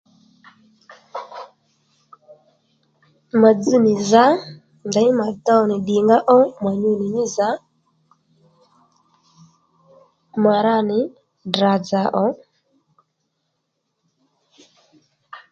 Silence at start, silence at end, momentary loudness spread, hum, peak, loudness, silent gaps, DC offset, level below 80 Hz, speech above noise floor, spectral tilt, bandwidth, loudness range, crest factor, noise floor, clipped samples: 0.9 s; 0.15 s; 20 LU; none; 0 dBFS; -17 LUFS; none; under 0.1%; -66 dBFS; 58 dB; -5.5 dB/octave; 7.8 kHz; 11 LU; 20 dB; -74 dBFS; under 0.1%